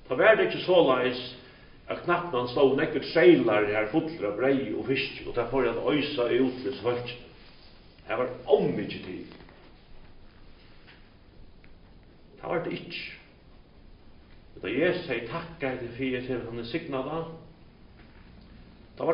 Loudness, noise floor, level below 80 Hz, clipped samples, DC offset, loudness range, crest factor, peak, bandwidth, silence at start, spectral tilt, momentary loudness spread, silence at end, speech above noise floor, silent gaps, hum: -27 LUFS; -53 dBFS; -54 dBFS; under 0.1%; under 0.1%; 14 LU; 24 dB; -6 dBFS; 5.4 kHz; 0.05 s; -4 dB/octave; 17 LU; 0 s; 27 dB; none; none